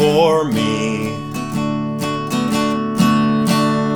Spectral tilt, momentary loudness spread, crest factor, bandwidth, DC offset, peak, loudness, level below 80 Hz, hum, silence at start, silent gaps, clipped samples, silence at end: -5.5 dB/octave; 8 LU; 14 dB; 19.5 kHz; under 0.1%; -2 dBFS; -17 LUFS; -48 dBFS; none; 0 s; none; under 0.1%; 0 s